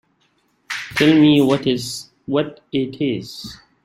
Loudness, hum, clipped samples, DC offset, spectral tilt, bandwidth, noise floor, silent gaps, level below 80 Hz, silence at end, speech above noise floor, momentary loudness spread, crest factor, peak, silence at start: -18 LUFS; none; under 0.1%; under 0.1%; -5.5 dB/octave; 15 kHz; -63 dBFS; none; -54 dBFS; 0.3 s; 46 dB; 18 LU; 18 dB; -2 dBFS; 0.7 s